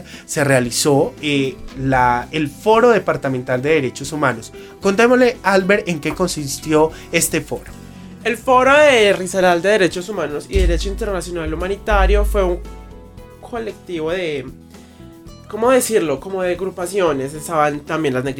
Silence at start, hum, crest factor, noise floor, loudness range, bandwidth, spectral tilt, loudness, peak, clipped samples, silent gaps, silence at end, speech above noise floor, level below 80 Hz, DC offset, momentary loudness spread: 0 s; none; 18 dB; -40 dBFS; 6 LU; 17.5 kHz; -4.5 dB/octave; -17 LUFS; 0 dBFS; under 0.1%; none; 0 s; 23 dB; -28 dBFS; under 0.1%; 13 LU